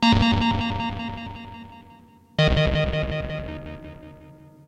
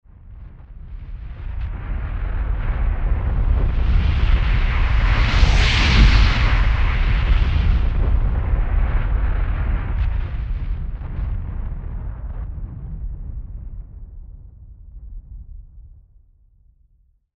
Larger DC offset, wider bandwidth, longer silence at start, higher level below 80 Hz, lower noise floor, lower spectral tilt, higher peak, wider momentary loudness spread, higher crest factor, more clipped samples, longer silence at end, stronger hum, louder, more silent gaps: neither; first, 9.8 kHz vs 7.6 kHz; second, 0 s vs 0.25 s; second, -34 dBFS vs -20 dBFS; second, -51 dBFS vs -58 dBFS; about the same, -6.5 dB/octave vs -6 dB/octave; second, -6 dBFS vs 0 dBFS; about the same, 23 LU vs 24 LU; about the same, 18 dB vs 18 dB; neither; second, 0.35 s vs 1.5 s; neither; second, -24 LUFS vs -21 LUFS; neither